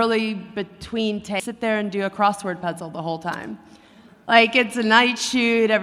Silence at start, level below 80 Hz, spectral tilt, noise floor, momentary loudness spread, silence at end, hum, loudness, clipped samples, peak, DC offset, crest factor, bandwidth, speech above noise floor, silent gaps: 0 s; -58 dBFS; -4 dB/octave; -49 dBFS; 15 LU; 0 s; none; -21 LUFS; under 0.1%; 0 dBFS; under 0.1%; 20 dB; 14 kHz; 28 dB; none